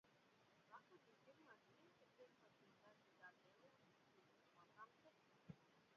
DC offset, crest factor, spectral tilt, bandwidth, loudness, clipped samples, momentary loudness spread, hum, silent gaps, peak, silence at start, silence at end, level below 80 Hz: under 0.1%; 24 dB; -4 dB/octave; 6.8 kHz; -67 LUFS; under 0.1%; 1 LU; none; none; -46 dBFS; 0.05 s; 0 s; under -90 dBFS